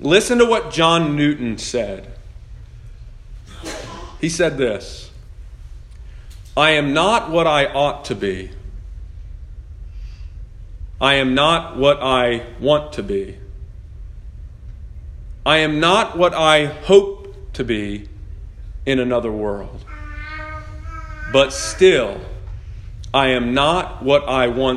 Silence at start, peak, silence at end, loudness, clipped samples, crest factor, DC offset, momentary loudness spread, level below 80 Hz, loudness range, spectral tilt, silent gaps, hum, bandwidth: 0 s; 0 dBFS; 0 s; -17 LUFS; under 0.1%; 20 dB; under 0.1%; 24 LU; -36 dBFS; 9 LU; -4.5 dB/octave; none; none; 12.5 kHz